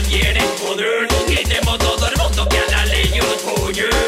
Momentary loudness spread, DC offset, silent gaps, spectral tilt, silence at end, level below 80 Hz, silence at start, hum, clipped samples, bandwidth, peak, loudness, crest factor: 3 LU; under 0.1%; none; -3.5 dB/octave; 0 s; -20 dBFS; 0 s; none; under 0.1%; 16 kHz; -4 dBFS; -16 LUFS; 12 dB